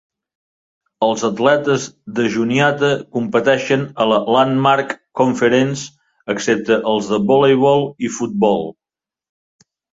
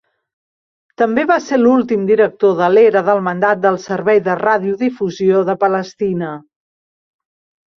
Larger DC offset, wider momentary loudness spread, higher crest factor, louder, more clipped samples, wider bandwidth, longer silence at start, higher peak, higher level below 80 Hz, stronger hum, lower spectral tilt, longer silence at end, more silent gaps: neither; about the same, 9 LU vs 8 LU; about the same, 16 dB vs 14 dB; about the same, -16 LUFS vs -14 LUFS; neither; first, 8 kHz vs 6.8 kHz; about the same, 1 s vs 1 s; about the same, -2 dBFS vs 0 dBFS; about the same, -58 dBFS vs -60 dBFS; neither; second, -5 dB/octave vs -7 dB/octave; about the same, 1.3 s vs 1.35 s; neither